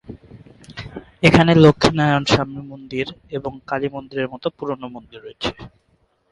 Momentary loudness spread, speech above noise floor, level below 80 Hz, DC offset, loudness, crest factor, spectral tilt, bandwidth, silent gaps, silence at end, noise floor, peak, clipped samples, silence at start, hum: 23 LU; 44 dB; -44 dBFS; under 0.1%; -18 LUFS; 20 dB; -6 dB/octave; 11.5 kHz; none; 0.65 s; -63 dBFS; 0 dBFS; under 0.1%; 0.1 s; none